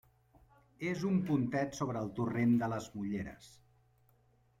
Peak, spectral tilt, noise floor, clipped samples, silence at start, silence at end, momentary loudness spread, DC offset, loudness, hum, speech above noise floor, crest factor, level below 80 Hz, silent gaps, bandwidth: -20 dBFS; -7 dB/octave; -70 dBFS; under 0.1%; 0.8 s; 1.1 s; 11 LU; under 0.1%; -35 LUFS; none; 36 dB; 16 dB; -66 dBFS; none; 14.5 kHz